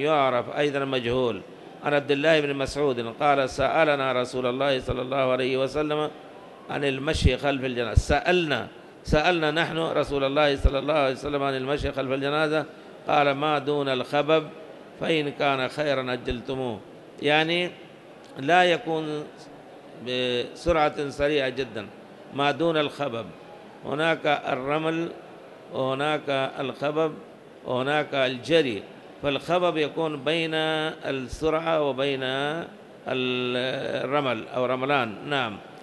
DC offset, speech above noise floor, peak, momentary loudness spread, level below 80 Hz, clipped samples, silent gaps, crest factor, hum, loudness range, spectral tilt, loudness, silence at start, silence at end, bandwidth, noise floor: under 0.1%; 21 dB; -4 dBFS; 15 LU; -42 dBFS; under 0.1%; none; 20 dB; none; 3 LU; -5.5 dB/octave; -25 LUFS; 0 s; 0 s; 12 kHz; -46 dBFS